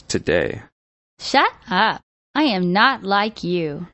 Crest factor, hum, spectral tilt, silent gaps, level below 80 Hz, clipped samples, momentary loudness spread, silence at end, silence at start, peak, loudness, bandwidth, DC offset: 20 dB; none; -4.5 dB/octave; 0.72-1.17 s, 2.03-2.34 s; -50 dBFS; under 0.1%; 11 LU; 0.05 s; 0.1 s; 0 dBFS; -19 LUFS; 8.4 kHz; under 0.1%